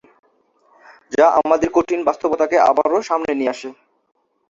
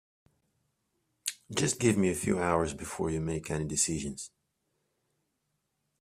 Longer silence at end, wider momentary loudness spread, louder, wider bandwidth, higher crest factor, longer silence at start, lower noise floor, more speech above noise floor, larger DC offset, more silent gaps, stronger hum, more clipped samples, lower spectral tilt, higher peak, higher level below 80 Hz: second, 0.75 s vs 1.75 s; about the same, 9 LU vs 11 LU; first, -17 LUFS vs -31 LUFS; second, 7.8 kHz vs 15.5 kHz; about the same, 18 dB vs 22 dB; second, 1.1 s vs 1.25 s; second, -59 dBFS vs -80 dBFS; second, 42 dB vs 50 dB; neither; neither; neither; neither; about the same, -5 dB/octave vs -4.5 dB/octave; first, -2 dBFS vs -10 dBFS; about the same, -54 dBFS vs -56 dBFS